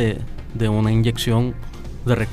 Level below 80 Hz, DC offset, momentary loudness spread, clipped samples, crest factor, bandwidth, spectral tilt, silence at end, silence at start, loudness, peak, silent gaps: -32 dBFS; under 0.1%; 14 LU; under 0.1%; 14 dB; 15 kHz; -6.5 dB/octave; 0 s; 0 s; -21 LUFS; -6 dBFS; none